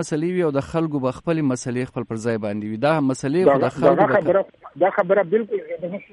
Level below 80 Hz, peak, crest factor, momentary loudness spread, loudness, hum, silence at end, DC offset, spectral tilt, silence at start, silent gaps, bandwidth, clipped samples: -56 dBFS; -4 dBFS; 16 dB; 10 LU; -21 LUFS; none; 0.1 s; under 0.1%; -6.5 dB/octave; 0 s; none; 11.5 kHz; under 0.1%